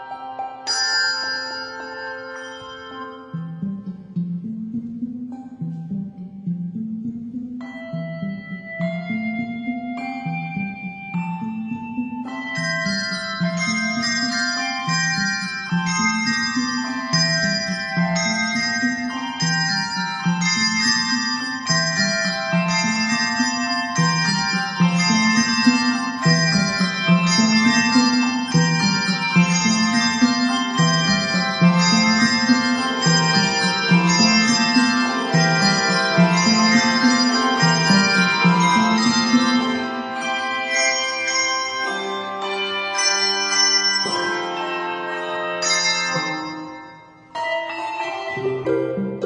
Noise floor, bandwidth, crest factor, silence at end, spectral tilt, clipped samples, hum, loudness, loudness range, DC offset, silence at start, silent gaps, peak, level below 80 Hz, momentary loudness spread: -43 dBFS; 10.5 kHz; 18 dB; 0 s; -3.5 dB/octave; under 0.1%; none; -19 LUFS; 13 LU; under 0.1%; 0 s; none; -2 dBFS; -60 dBFS; 15 LU